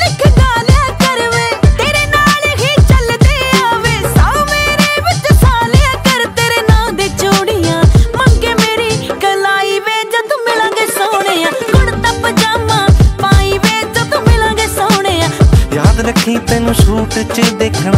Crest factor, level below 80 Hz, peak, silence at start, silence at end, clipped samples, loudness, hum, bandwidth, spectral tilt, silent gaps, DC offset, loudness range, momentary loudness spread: 10 dB; -16 dBFS; 0 dBFS; 0 s; 0 s; under 0.1%; -10 LUFS; none; 16.5 kHz; -5 dB/octave; none; under 0.1%; 2 LU; 4 LU